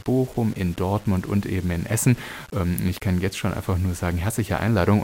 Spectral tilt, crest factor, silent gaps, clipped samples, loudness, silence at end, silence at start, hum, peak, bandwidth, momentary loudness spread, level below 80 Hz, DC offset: -6 dB/octave; 18 dB; none; under 0.1%; -24 LUFS; 0 s; 0.05 s; none; -6 dBFS; 16.5 kHz; 5 LU; -40 dBFS; under 0.1%